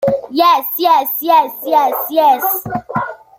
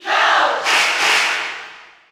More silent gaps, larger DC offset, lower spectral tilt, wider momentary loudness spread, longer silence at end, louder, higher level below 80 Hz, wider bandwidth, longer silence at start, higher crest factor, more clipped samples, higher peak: neither; neither; first, -4.5 dB/octave vs 1 dB/octave; second, 8 LU vs 11 LU; about the same, 0.25 s vs 0.3 s; about the same, -14 LUFS vs -14 LUFS; first, -54 dBFS vs -66 dBFS; second, 17 kHz vs over 20 kHz; about the same, 0 s vs 0 s; about the same, 14 dB vs 14 dB; neither; about the same, 0 dBFS vs -2 dBFS